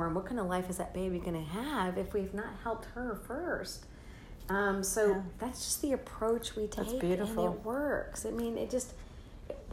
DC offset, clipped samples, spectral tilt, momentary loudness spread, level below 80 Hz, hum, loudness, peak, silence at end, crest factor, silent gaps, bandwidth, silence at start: under 0.1%; under 0.1%; -4.5 dB/octave; 15 LU; -50 dBFS; none; -35 LUFS; -18 dBFS; 0 s; 18 dB; none; 16 kHz; 0 s